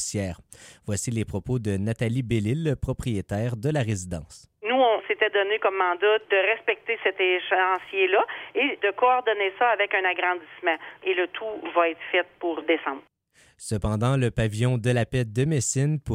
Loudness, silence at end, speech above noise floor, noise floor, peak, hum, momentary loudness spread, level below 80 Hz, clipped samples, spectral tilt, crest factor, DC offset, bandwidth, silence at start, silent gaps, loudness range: -25 LUFS; 0 s; 36 dB; -60 dBFS; -8 dBFS; none; 8 LU; -48 dBFS; under 0.1%; -5 dB/octave; 18 dB; under 0.1%; 15 kHz; 0 s; none; 5 LU